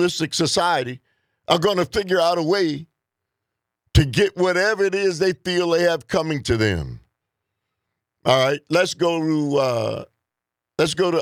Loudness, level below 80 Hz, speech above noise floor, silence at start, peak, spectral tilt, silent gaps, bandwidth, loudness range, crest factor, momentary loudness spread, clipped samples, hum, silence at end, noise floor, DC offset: -20 LUFS; -40 dBFS; 65 dB; 0 s; -2 dBFS; -5 dB/octave; none; 15.5 kHz; 2 LU; 20 dB; 9 LU; under 0.1%; none; 0 s; -85 dBFS; under 0.1%